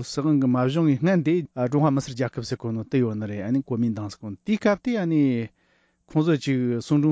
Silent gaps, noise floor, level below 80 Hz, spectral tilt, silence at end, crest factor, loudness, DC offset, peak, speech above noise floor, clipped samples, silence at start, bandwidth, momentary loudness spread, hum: none; -65 dBFS; -58 dBFS; -7.5 dB/octave; 0 s; 14 dB; -24 LUFS; under 0.1%; -8 dBFS; 43 dB; under 0.1%; 0 s; 8 kHz; 8 LU; none